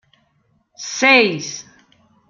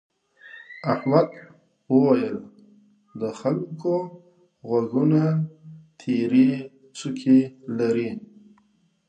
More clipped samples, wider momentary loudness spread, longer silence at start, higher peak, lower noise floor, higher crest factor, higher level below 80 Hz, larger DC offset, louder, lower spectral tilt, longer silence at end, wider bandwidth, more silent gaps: neither; first, 21 LU vs 18 LU; first, 0.8 s vs 0.45 s; about the same, 0 dBFS vs -2 dBFS; about the same, -63 dBFS vs -64 dBFS; about the same, 20 dB vs 22 dB; about the same, -68 dBFS vs -72 dBFS; neither; first, -14 LUFS vs -23 LUFS; second, -2.5 dB/octave vs -8 dB/octave; second, 0.65 s vs 0.9 s; second, 7.4 kHz vs 8.8 kHz; neither